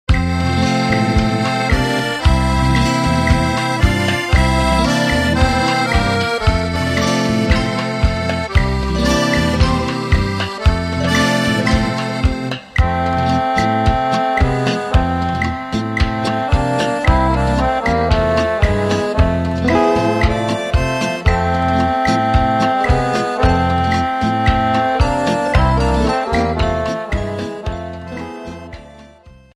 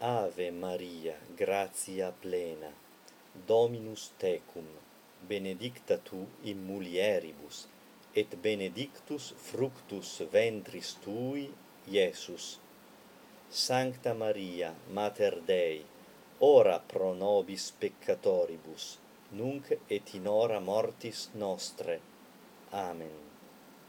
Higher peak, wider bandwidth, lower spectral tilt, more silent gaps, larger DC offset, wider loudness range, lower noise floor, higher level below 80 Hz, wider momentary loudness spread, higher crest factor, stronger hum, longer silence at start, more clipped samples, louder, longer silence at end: first, 0 dBFS vs -12 dBFS; second, 13.5 kHz vs 18.5 kHz; first, -6 dB/octave vs -4 dB/octave; neither; neither; second, 2 LU vs 7 LU; second, -43 dBFS vs -58 dBFS; first, -22 dBFS vs -78 dBFS; second, 5 LU vs 15 LU; second, 16 dB vs 22 dB; neither; about the same, 0.1 s vs 0 s; neither; first, -16 LUFS vs -33 LUFS; first, 0.25 s vs 0 s